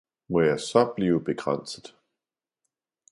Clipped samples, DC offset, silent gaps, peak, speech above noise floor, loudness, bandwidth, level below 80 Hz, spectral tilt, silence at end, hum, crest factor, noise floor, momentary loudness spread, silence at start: under 0.1%; under 0.1%; none; -6 dBFS; 65 dB; -25 LUFS; 11.5 kHz; -60 dBFS; -6 dB/octave; 1.25 s; none; 22 dB; -90 dBFS; 11 LU; 0.3 s